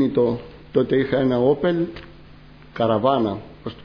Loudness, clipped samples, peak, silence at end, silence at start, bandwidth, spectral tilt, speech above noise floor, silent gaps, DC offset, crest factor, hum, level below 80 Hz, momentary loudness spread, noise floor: -21 LUFS; under 0.1%; -4 dBFS; 0 s; 0 s; 5.4 kHz; -9.5 dB/octave; 25 dB; none; under 0.1%; 18 dB; none; -50 dBFS; 13 LU; -45 dBFS